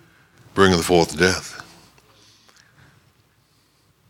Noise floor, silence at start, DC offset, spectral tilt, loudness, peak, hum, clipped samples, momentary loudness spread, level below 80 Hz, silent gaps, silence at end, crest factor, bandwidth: -61 dBFS; 0.55 s; under 0.1%; -4.5 dB/octave; -18 LUFS; 0 dBFS; none; under 0.1%; 18 LU; -50 dBFS; none; 2.5 s; 22 dB; 17.5 kHz